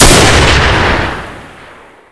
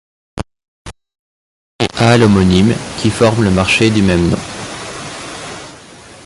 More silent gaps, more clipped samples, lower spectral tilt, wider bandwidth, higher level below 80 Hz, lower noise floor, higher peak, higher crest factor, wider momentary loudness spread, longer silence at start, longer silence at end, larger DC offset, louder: second, none vs 0.68-0.85 s, 1.19-1.79 s; first, 4% vs under 0.1%; second, -3.5 dB/octave vs -5.5 dB/octave; about the same, 11 kHz vs 11.5 kHz; first, -16 dBFS vs -34 dBFS; about the same, -36 dBFS vs -37 dBFS; about the same, 0 dBFS vs 0 dBFS; about the same, 10 dB vs 14 dB; about the same, 18 LU vs 19 LU; second, 0 s vs 0.35 s; first, 0.65 s vs 0 s; neither; first, -7 LUFS vs -12 LUFS